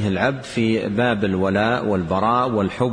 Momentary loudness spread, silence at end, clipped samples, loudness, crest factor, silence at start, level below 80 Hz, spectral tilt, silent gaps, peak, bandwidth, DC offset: 3 LU; 0 s; under 0.1%; -20 LUFS; 14 dB; 0 s; -48 dBFS; -7 dB/octave; none; -6 dBFS; 10 kHz; under 0.1%